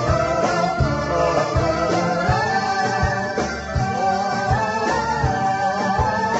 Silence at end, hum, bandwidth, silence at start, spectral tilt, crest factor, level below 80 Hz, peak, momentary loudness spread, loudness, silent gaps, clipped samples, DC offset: 0 s; none; 8.2 kHz; 0 s; -5.5 dB/octave; 14 dB; -34 dBFS; -6 dBFS; 2 LU; -20 LUFS; none; under 0.1%; under 0.1%